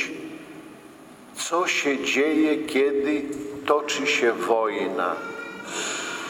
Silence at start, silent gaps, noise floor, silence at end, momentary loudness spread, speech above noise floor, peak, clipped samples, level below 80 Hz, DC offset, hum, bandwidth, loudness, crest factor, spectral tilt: 0 s; none; -46 dBFS; 0 s; 17 LU; 23 dB; -6 dBFS; under 0.1%; -66 dBFS; under 0.1%; none; 16.5 kHz; -24 LUFS; 20 dB; -2.5 dB/octave